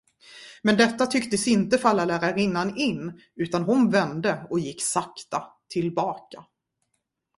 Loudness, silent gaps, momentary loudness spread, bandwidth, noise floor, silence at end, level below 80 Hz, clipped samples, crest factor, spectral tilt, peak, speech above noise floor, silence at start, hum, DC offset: -24 LUFS; none; 12 LU; 11.5 kHz; -78 dBFS; 0.95 s; -62 dBFS; under 0.1%; 20 dB; -4.5 dB/octave; -6 dBFS; 54 dB; 0.3 s; none; under 0.1%